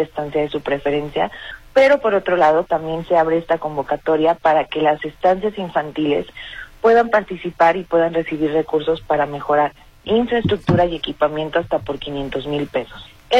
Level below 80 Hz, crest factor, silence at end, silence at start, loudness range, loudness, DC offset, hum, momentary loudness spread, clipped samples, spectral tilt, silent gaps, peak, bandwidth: -44 dBFS; 16 dB; 0 s; 0 s; 2 LU; -18 LUFS; under 0.1%; none; 9 LU; under 0.1%; -7 dB/octave; none; -4 dBFS; 10 kHz